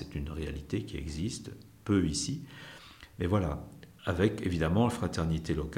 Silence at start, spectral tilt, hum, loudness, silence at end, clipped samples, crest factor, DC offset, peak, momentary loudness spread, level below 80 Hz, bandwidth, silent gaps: 0 s; -6 dB/octave; none; -32 LUFS; 0 s; under 0.1%; 20 dB; under 0.1%; -14 dBFS; 19 LU; -46 dBFS; 16.5 kHz; none